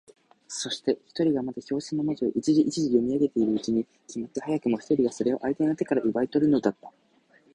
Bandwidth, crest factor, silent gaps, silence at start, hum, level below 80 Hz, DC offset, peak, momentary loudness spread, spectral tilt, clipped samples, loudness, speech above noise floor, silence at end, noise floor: 10.5 kHz; 18 dB; none; 0.5 s; none; -64 dBFS; under 0.1%; -8 dBFS; 10 LU; -5.5 dB/octave; under 0.1%; -26 LUFS; 35 dB; 0.65 s; -61 dBFS